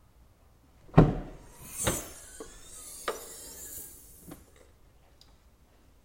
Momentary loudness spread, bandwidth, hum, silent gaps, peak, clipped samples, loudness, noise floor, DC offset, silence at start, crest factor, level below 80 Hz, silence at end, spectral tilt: 26 LU; 16.5 kHz; none; none; -6 dBFS; under 0.1%; -30 LUFS; -60 dBFS; under 0.1%; 0.95 s; 28 dB; -44 dBFS; 1.7 s; -5.5 dB/octave